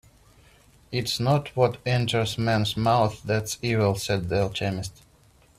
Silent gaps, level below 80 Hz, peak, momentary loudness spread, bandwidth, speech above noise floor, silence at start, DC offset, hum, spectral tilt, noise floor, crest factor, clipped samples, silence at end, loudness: none; -52 dBFS; -6 dBFS; 7 LU; 14.5 kHz; 33 dB; 0.9 s; under 0.1%; none; -5.5 dB/octave; -57 dBFS; 18 dB; under 0.1%; 0.7 s; -25 LUFS